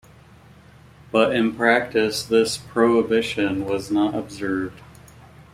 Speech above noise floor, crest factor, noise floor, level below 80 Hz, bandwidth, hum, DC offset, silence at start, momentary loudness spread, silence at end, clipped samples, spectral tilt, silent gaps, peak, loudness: 28 dB; 20 dB; -48 dBFS; -54 dBFS; 16 kHz; none; under 0.1%; 1.15 s; 8 LU; 0.3 s; under 0.1%; -4.5 dB/octave; none; -2 dBFS; -21 LUFS